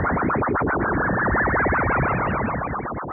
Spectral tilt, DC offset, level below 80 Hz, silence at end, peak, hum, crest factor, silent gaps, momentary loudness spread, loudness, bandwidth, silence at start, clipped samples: -12 dB/octave; under 0.1%; -34 dBFS; 0 s; -10 dBFS; none; 12 dB; none; 6 LU; -22 LUFS; 3 kHz; 0 s; under 0.1%